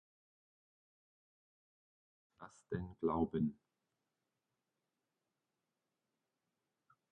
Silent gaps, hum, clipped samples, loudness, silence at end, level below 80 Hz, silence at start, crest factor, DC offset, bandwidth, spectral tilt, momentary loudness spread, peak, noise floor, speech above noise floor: none; none; under 0.1%; -40 LUFS; 3.6 s; -66 dBFS; 2.4 s; 26 dB; under 0.1%; 5 kHz; -8.5 dB/octave; 22 LU; -22 dBFS; -90 dBFS; 50 dB